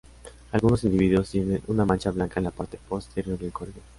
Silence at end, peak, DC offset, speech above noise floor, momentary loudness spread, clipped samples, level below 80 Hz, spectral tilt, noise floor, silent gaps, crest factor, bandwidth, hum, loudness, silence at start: 0.2 s; -6 dBFS; under 0.1%; 20 dB; 12 LU; under 0.1%; -42 dBFS; -7.5 dB/octave; -45 dBFS; none; 20 dB; 11.5 kHz; none; -26 LUFS; 0.25 s